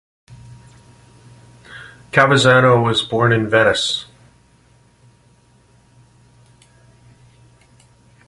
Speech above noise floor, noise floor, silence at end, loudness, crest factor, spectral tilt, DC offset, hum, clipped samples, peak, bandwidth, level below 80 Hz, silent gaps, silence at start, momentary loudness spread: 39 dB; -53 dBFS; 4.25 s; -14 LUFS; 20 dB; -5 dB/octave; under 0.1%; none; under 0.1%; 0 dBFS; 11.5 kHz; -52 dBFS; none; 0.3 s; 26 LU